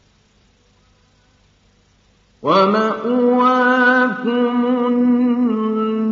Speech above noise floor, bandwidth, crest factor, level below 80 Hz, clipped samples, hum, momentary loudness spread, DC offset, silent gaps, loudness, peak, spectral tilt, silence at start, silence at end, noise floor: 41 dB; 6.8 kHz; 16 dB; -62 dBFS; under 0.1%; none; 6 LU; under 0.1%; none; -16 LUFS; -2 dBFS; -3.5 dB/octave; 2.4 s; 0 s; -56 dBFS